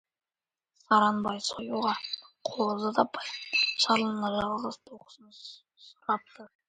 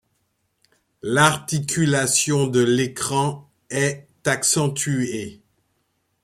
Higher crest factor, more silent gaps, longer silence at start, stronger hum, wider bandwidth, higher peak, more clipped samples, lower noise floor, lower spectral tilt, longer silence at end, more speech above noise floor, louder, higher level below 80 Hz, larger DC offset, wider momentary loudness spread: about the same, 22 dB vs 22 dB; neither; second, 0.9 s vs 1.05 s; neither; second, 9.4 kHz vs 15.5 kHz; second, -8 dBFS vs -2 dBFS; neither; first, under -90 dBFS vs -70 dBFS; about the same, -3.5 dB/octave vs -4 dB/octave; second, 0.2 s vs 0.9 s; first, over 60 dB vs 50 dB; second, -29 LUFS vs -20 LUFS; second, -68 dBFS vs -58 dBFS; neither; first, 16 LU vs 11 LU